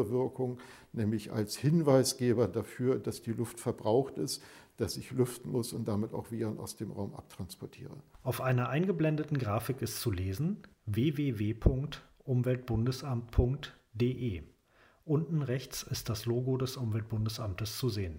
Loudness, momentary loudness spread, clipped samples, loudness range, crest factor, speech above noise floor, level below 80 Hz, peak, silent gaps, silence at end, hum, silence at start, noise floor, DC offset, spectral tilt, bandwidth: -33 LUFS; 12 LU; under 0.1%; 5 LU; 22 dB; 33 dB; -48 dBFS; -10 dBFS; none; 0 s; none; 0 s; -65 dBFS; under 0.1%; -6 dB/octave; 16 kHz